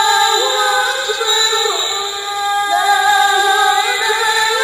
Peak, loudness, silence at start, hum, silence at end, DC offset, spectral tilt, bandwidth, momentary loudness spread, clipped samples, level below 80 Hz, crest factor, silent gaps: 0 dBFS; -13 LUFS; 0 s; none; 0 s; under 0.1%; 2 dB/octave; 15.5 kHz; 6 LU; under 0.1%; -56 dBFS; 14 dB; none